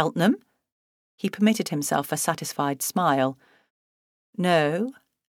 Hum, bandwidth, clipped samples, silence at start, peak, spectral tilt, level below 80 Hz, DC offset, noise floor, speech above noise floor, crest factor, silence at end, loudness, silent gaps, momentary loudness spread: none; 18.5 kHz; under 0.1%; 0 s; -6 dBFS; -4.5 dB/octave; -74 dBFS; under 0.1%; under -90 dBFS; over 66 dB; 20 dB; 0.5 s; -25 LUFS; 0.72-1.18 s, 3.70-4.33 s; 10 LU